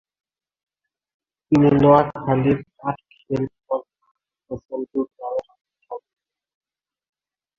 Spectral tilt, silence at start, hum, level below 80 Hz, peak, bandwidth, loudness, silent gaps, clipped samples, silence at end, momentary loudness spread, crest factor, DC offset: -9.5 dB/octave; 1.5 s; none; -52 dBFS; 0 dBFS; 7 kHz; -21 LUFS; 4.11-4.15 s; under 0.1%; 1.6 s; 21 LU; 22 dB; under 0.1%